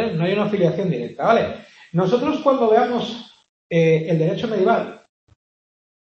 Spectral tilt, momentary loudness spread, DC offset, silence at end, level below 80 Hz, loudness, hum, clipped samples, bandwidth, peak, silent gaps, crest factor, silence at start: -7.5 dB/octave; 10 LU; under 0.1%; 1.15 s; -60 dBFS; -19 LUFS; none; under 0.1%; 7 kHz; -2 dBFS; 3.49-3.70 s; 18 dB; 0 s